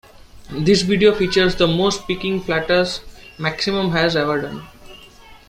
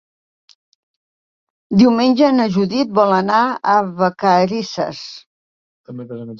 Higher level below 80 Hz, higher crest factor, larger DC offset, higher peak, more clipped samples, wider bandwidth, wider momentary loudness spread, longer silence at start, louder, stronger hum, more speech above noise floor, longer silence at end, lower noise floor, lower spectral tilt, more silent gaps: first, -42 dBFS vs -60 dBFS; about the same, 18 dB vs 16 dB; neither; about the same, -2 dBFS vs -2 dBFS; neither; first, 15.5 kHz vs 7.2 kHz; second, 10 LU vs 18 LU; second, 0.35 s vs 1.7 s; second, -18 LUFS vs -15 LUFS; neither; second, 26 dB vs over 75 dB; first, 0.15 s vs 0 s; second, -43 dBFS vs under -90 dBFS; second, -5 dB/octave vs -6.5 dB/octave; second, none vs 5.26-5.84 s